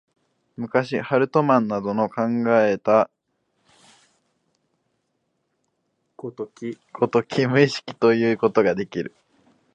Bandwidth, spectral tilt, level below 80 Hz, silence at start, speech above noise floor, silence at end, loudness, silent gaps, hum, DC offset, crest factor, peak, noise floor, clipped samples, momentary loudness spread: 9 kHz; -7 dB/octave; -66 dBFS; 0.6 s; 53 dB; 0.65 s; -21 LUFS; none; none; under 0.1%; 20 dB; -2 dBFS; -73 dBFS; under 0.1%; 15 LU